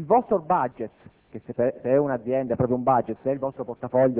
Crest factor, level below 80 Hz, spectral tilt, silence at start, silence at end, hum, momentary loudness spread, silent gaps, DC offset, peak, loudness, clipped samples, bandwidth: 16 dB; -56 dBFS; -12.5 dB/octave; 0 s; 0 s; none; 14 LU; none; under 0.1%; -8 dBFS; -24 LUFS; under 0.1%; 3.6 kHz